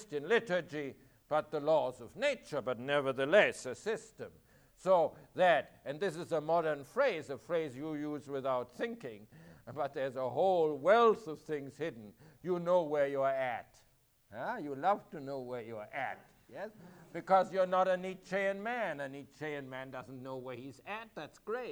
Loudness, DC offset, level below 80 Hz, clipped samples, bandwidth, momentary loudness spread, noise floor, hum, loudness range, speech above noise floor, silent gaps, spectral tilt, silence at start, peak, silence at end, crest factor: -34 LUFS; under 0.1%; -74 dBFS; under 0.1%; over 20 kHz; 17 LU; -69 dBFS; none; 7 LU; 35 dB; none; -5.5 dB/octave; 0 s; -14 dBFS; 0 s; 22 dB